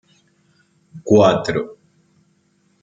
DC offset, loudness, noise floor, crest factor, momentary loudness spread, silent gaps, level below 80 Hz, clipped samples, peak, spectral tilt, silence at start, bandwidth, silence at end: under 0.1%; -16 LUFS; -61 dBFS; 20 dB; 21 LU; none; -58 dBFS; under 0.1%; -2 dBFS; -6.5 dB/octave; 0.95 s; 7.8 kHz; 1.1 s